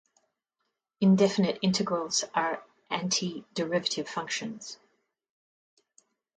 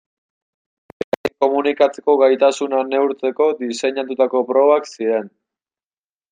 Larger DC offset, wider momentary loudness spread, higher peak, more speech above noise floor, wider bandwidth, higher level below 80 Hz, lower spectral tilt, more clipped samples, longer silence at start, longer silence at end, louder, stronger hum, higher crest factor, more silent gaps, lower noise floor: neither; first, 15 LU vs 8 LU; second, -10 dBFS vs -2 dBFS; second, 54 dB vs over 73 dB; about the same, 9 kHz vs 9.6 kHz; second, -72 dBFS vs -66 dBFS; about the same, -4.5 dB/octave vs -4 dB/octave; neither; second, 1 s vs 1.25 s; first, 1.6 s vs 1.05 s; second, -28 LUFS vs -18 LUFS; neither; about the same, 20 dB vs 16 dB; neither; second, -82 dBFS vs under -90 dBFS